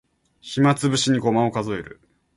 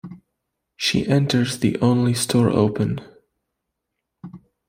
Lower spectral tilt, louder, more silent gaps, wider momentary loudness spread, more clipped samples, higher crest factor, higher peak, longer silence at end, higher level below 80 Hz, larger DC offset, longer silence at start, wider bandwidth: about the same, -5 dB/octave vs -5.5 dB/octave; about the same, -21 LUFS vs -20 LUFS; neither; first, 12 LU vs 7 LU; neither; about the same, 16 dB vs 18 dB; about the same, -6 dBFS vs -4 dBFS; first, 0.45 s vs 0.3 s; about the same, -56 dBFS vs -54 dBFS; neither; first, 0.45 s vs 0.05 s; second, 11.5 kHz vs 16 kHz